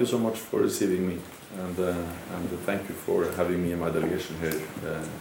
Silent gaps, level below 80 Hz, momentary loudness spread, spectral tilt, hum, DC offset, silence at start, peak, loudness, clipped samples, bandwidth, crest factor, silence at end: none; -60 dBFS; 8 LU; -5.5 dB/octave; none; under 0.1%; 0 s; -12 dBFS; -29 LUFS; under 0.1%; over 20 kHz; 16 dB; 0 s